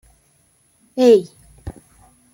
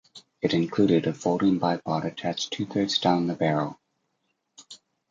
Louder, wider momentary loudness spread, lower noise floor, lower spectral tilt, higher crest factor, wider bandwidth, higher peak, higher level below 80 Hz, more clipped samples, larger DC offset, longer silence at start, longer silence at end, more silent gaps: first, -15 LUFS vs -25 LUFS; first, 25 LU vs 8 LU; second, -59 dBFS vs -76 dBFS; about the same, -6 dB/octave vs -5.5 dB/octave; about the same, 18 dB vs 18 dB; first, 15 kHz vs 7.8 kHz; first, -2 dBFS vs -8 dBFS; first, -50 dBFS vs -64 dBFS; neither; neither; first, 0.95 s vs 0.15 s; first, 0.65 s vs 0.35 s; neither